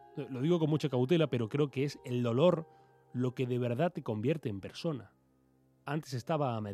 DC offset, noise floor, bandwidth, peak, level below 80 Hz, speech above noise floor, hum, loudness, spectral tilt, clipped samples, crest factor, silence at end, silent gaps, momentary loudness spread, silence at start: under 0.1%; -69 dBFS; 13.5 kHz; -14 dBFS; -76 dBFS; 37 dB; none; -33 LUFS; -7.5 dB/octave; under 0.1%; 20 dB; 0 s; none; 11 LU; 0.15 s